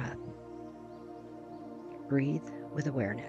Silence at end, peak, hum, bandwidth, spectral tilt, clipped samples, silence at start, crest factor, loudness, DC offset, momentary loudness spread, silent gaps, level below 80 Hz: 0 s; -18 dBFS; none; 8.2 kHz; -8 dB/octave; under 0.1%; 0 s; 18 dB; -38 LUFS; under 0.1%; 16 LU; none; -66 dBFS